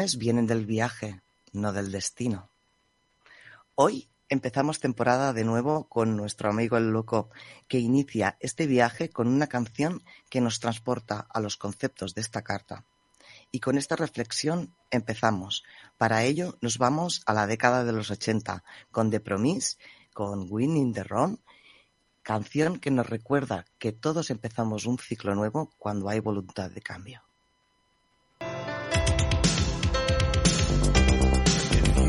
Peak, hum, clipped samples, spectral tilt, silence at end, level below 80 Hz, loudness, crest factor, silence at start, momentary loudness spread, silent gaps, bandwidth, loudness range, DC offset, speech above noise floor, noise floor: -4 dBFS; none; under 0.1%; -5 dB/octave; 0 s; -36 dBFS; -27 LUFS; 22 dB; 0 s; 12 LU; none; 11.5 kHz; 6 LU; under 0.1%; 42 dB; -70 dBFS